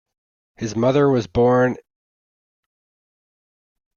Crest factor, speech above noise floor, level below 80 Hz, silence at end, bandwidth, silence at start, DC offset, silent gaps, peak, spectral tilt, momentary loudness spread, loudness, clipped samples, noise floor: 18 dB; over 73 dB; -50 dBFS; 2.2 s; 7.2 kHz; 0.6 s; under 0.1%; none; -6 dBFS; -7 dB/octave; 13 LU; -18 LUFS; under 0.1%; under -90 dBFS